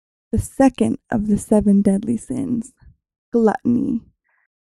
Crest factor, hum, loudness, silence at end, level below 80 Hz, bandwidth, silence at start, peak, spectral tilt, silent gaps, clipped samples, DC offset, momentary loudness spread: 18 dB; none; -19 LUFS; 0.8 s; -40 dBFS; 12.5 kHz; 0.35 s; -2 dBFS; -7.5 dB/octave; 3.18-3.32 s; under 0.1%; under 0.1%; 10 LU